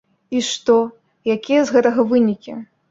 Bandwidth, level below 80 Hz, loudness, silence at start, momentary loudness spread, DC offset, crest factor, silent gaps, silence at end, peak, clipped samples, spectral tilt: 7.8 kHz; -62 dBFS; -18 LUFS; 0.3 s; 13 LU; under 0.1%; 16 dB; none; 0.25 s; -2 dBFS; under 0.1%; -4.5 dB/octave